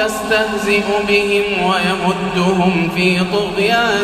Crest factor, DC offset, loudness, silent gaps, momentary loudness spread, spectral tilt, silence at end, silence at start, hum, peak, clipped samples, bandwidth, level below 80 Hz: 14 dB; under 0.1%; -15 LUFS; none; 3 LU; -5 dB/octave; 0 s; 0 s; none; -2 dBFS; under 0.1%; 15 kHz; -42 dBFS